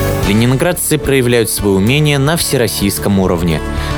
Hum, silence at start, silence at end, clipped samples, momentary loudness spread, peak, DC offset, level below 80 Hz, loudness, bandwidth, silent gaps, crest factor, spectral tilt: none; 0 s; 0 s; under 0.1%; 3 LU; 0 dBFS; under 0.1%; -26 dBFS; -12 LUFS; over 20 kHz; none; 12 dB; -5 dB/octave